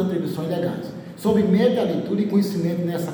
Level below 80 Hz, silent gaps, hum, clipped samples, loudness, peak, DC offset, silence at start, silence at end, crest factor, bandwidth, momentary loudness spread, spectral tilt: -62 dBFS; none; none; under 0.1%; -22 LUFS; -6 dBFS; under 0.1%; 0 s; 0 s; 14 dB; 19 kHz; 8 LU; -7.5 dB/octave